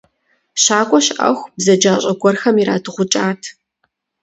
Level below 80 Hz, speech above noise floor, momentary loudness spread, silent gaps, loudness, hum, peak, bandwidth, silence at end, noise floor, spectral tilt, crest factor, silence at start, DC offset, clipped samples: -62 dBFS; 54 dB; 8 LU; none; -15 LUFS; none; 0 dBFS; 8.2 kHz; 0.7 s; -68 dBFS; -3.5 dB/octave; 16 dB; 0.55 s; under 0.1%; under 0.1%